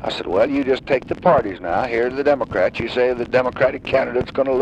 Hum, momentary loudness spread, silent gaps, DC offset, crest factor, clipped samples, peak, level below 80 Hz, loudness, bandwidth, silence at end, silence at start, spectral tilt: none; 5 LU; none; under 0.1%; 16 dB; under 0.1%; -4 dBFS; -44 dBFS; -19 LUFS; 8.6 kHz; 0 s; 0 s; -6.5 dB/octave